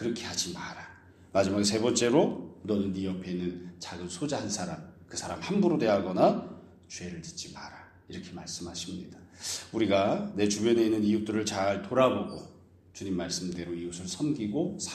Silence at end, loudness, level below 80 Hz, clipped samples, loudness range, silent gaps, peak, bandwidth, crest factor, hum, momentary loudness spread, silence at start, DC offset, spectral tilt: 0 s; -30 LUFS; -62 dBFS; under 0.1%; 6 LU; none; -8 dBFS; 14 kHz; 22 dB; none; 17 LU; 0 s; under 0.1%; -4.5 dB/octave